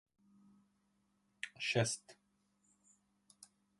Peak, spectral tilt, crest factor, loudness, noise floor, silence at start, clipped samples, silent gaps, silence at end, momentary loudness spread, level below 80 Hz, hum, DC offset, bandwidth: -20 dBFS; -3.5 dB/octave; 24 dB; -38 LUFS; -79 dBFS; 1.45 s; under 0.1%; none; 1.65 s; 26 LU; -78 dBFS; none; under 0.1%; 11.5 kHz